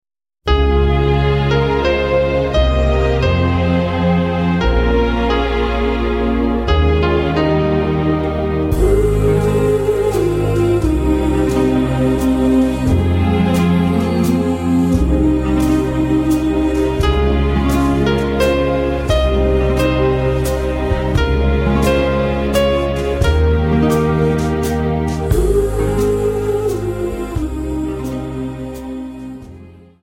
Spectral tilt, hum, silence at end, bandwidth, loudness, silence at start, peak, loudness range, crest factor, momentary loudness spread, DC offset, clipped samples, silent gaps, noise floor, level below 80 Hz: -7 dB/octave; none; 0.3 s; 16.5 kHz; -16 LUFS; 0.45 s; -2 dBFS; 2 LU; 12 dB; 5 LU; under 0.1%; under 0.1%; none; -39 dBFS; -22 dBFS